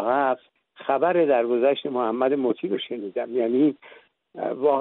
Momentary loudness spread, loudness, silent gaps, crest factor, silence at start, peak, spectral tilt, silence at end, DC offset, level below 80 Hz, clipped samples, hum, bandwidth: 11 LU; -24 LUFS; none; 16 dB; 0 s; -8 dBFS; -4 dB/octave; 0 s; under 0.1%; -76 dBFS; under 0.1%; none; 4.1 kHz